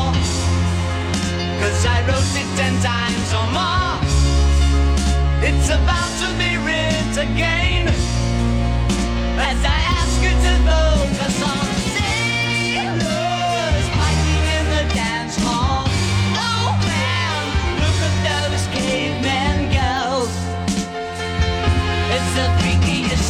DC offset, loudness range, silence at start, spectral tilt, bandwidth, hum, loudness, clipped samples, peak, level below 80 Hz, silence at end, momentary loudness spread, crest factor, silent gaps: under 0.1%; 2 LU; 0 s; -4.5 dB/octave; 13 kHz; none; -18 LUFS; under 0.1%; -6 dBFS; -24 dBFS; 0 s; 4 LU; 12 dB; none